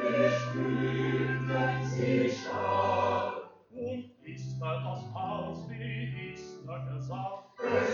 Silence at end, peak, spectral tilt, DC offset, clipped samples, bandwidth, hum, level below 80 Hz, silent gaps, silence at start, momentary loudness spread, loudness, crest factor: 0 s; -14 dBFS; -7 dB/octave; under 0.1%; under 0.1%; 7.2 kHz; none; -64 dBFS; none; 0 s; 13 LU; -32 LUFS; 16 dB